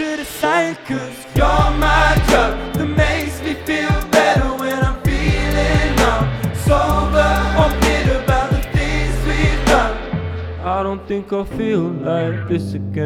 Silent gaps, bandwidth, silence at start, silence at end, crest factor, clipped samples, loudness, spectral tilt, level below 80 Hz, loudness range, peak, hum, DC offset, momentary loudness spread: none; 16.5 kHz; 0 s; 0 s; 16 dB; under 0.1%; -17 LUFS; -5.5 dB/octave; -22 dBFS; 3 LU; 0 dBFS; none; under 0.1%; 9 LU